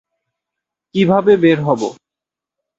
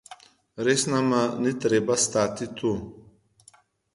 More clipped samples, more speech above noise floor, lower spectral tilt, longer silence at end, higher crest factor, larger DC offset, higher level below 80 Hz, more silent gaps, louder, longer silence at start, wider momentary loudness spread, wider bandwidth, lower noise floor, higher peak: neither; first, 73 dB vs 34 dB; first, -7 dB/octave vs -4 dB/octave; about the same, 0.85 s vs 0.95 s; about the same, 16 dB vs 18 dB; neither; about the same, -58 dBFS vs -58 dBFS; neither; first, -14 LUFS vs -24 LUFS; first, 0.95 s vs 0.1 s; first, 12 LU vs 9 LU; second, 8 kHz vs 11.5 kHz; first, -86 dBFS vs -58 dBFS; first, -2 dBFS vs -8 dBFS